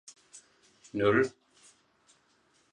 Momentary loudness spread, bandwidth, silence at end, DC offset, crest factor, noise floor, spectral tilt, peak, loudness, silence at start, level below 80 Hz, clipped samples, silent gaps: 27 LU; 10.5 kHz; 1.45 s; under 0.1%; 20 dB; -69 dBFS; -5.5 dB/octave; -14 dBFS; -29 LUFS; 0.35 s; -66 dBFS; under 0.1%; none